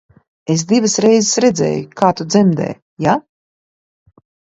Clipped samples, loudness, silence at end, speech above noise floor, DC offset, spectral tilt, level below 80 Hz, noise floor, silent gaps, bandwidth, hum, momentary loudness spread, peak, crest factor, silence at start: under 0.1%; -15 LUFS; 1.3 s; over 76 dB; under 0.1%; -5 dB/octave; -56 dBFS; under -90 dBFS; 2.82-2.97 s; 8.2 kHz; none; 8 LU; 0 dBFS; 16 dB; 0.5 s